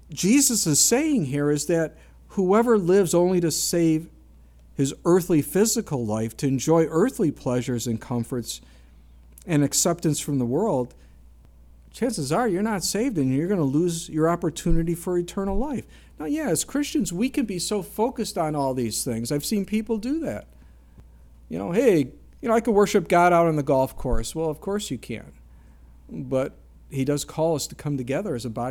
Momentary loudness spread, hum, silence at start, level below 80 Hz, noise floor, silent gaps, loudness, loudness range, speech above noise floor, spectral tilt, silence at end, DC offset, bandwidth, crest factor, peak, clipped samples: 11 LU; none; 0.1 s; -40 dBFS; -50 dBFS; none; -23 LUFS; 6 LU; 27 dB; -5 dB/octave; 0 s; under 0.1%; 18 kHz; 18 dB; -6 dBFS; under 0.1%